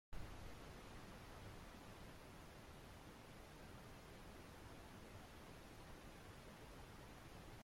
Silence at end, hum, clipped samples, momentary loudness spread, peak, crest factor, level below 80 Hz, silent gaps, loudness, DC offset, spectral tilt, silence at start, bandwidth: 0 s; none; under 0.1%; 2 LU; -38 dBFS; 18 dB; -64 dBFS; none; -59 LUFS; under 0.1%; -4.5 dB/octave; 0.1 s; 16.5 kHz